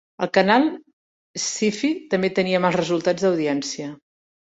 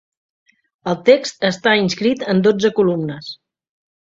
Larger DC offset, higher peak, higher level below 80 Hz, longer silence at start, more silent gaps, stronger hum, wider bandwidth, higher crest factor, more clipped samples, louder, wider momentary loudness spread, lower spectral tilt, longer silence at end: neither; about the same, -2 dBFS vs 0 dBFS; about the same, -64 dBFS vs -60 dBFS; second, 0.2 s vs 0.85 s; first, 0.93-1.34 s vs none; neither; about the same, 8.2 kHz vs 7.8 kHz; about the same, 20 dB vs 18 dB; neither; second, -21 LUFS vs -16 LUFS; about the same, 13 LU vs 15 LU; about the same, -4.5 dB/octave vs -5.5 dB/octave; about the same, 0.65 s vs 0.7 s